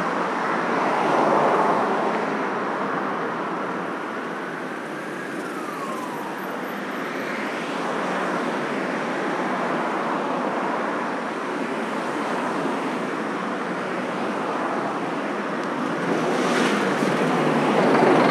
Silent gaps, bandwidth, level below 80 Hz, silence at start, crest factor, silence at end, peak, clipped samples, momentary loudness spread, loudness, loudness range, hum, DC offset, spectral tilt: none; 14 kHz; -80 dBFS; 0 s; 18 dB; 0 s; -4 dBFS; under 0.1%; 10 LU; -24 LUFS; 7 LU; none; under 0.1%; -5 dB/octave